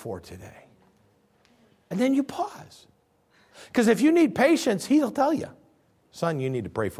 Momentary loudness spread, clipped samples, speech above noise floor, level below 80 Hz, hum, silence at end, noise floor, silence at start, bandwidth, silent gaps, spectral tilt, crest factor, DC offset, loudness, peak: 19 LU; under 0.1%; 39 dB; -60 dBFS; none; 0 s; -63 dBFS; 0 s; 16 kHz; none; -5.5 dB/octave; 18 dB; under 0.1%; -24 LUFS; -8 dBFS